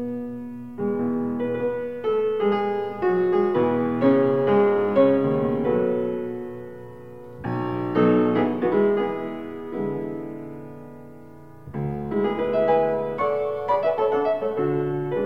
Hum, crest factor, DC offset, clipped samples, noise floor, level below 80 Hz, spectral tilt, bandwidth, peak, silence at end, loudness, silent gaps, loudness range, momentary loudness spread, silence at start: none; 16 dB; 0.4%; under 0.1%; -45 dBFS; -56 dBFS; -9.5 dB/octave; 5.6 kHz; -8 dBFS; 0 s; -23 LUFS; none; 7 LU; 16 LU; 0 s